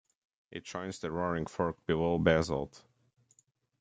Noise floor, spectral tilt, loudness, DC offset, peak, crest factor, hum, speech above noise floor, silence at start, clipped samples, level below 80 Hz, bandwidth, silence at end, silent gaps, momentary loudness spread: -71 dBFS; -6 dB/octave; -32 LUFS; under 0.1%; -10 dBFS; 24 dB; none; 39 dB; 0.5 s; under 0.1%; -58 dBFS; 9.2 kHz; 1.05 s; none; 16 LU